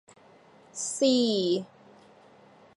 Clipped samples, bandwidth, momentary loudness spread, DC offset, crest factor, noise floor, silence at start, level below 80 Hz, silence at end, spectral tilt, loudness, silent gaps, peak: under 0.1%; 11.5 kHz; 18 LU; under 0.1%; 16 dB; -56 dBFS; 0.75 s; -82 dBFS; 1.1 s; -4 dB/octave; -26 LUFS; none; -14 dBFS